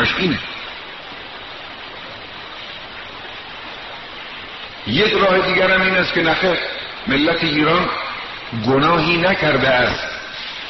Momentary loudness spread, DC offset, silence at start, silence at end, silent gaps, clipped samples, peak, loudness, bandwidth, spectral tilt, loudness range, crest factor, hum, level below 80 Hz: 17 LU; 0.3%; 0 s; 0 s; none; under 0.1%; -2 dBFS; -17 LUFS; 6.2 kHz; -2.5 dB/octave; 15 LU; 18 dB; none; -44 dBFS